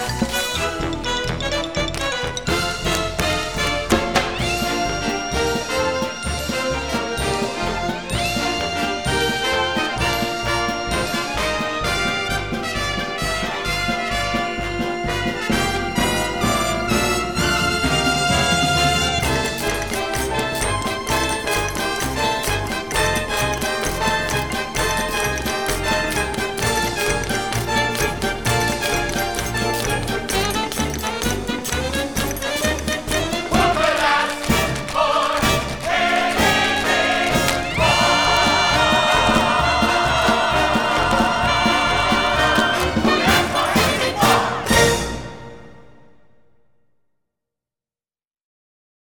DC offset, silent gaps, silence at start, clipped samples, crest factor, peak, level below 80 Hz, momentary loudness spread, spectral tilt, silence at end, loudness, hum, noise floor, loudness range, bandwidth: 0.5%; none; 0 s; under 0.1%; 20 dB; 0 dBFS; -34 dBFS; 7 LU; -3.5 dB/octave; 3.2 s; -19 LUFS; none; under -90 dBFS; 6 LU; over 20 kHz